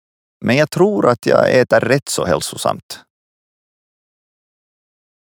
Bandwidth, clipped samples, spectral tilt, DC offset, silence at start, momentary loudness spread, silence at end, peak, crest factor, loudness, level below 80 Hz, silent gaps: 19 kHz; under 0.1%; -5 dB/octave; under 0.1%; 0.4 s; 13 LU; 2.35 s; 0 dBFS; 16 dB; -15 LUFS; -54 dBFS; 2.83-2.89 s